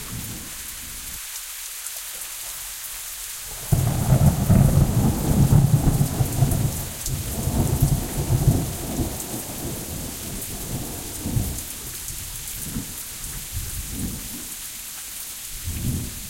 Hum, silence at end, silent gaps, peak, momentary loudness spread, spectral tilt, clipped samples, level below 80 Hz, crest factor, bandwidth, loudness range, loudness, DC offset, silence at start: none; 0 s; none; -4 dBFS; 13 LU; -5 dB/octave; under 0.1%; -32 dBFS; 20 dB; 17 kHz; 10 LU; -25 LUFS; under 0.1%; 0 s